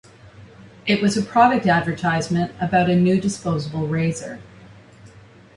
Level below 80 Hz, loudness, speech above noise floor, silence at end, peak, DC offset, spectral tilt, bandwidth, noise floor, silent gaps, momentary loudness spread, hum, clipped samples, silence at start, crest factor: -52 dBFS; -20 LUFS; 27 dB; 0.5 s; -2 dBFS; under 0.1%; -6 dB/octave; 11.5 kHz; -46 dBFS; none; 10 LU; none; under 0.1%; 0.25 s; 18 dB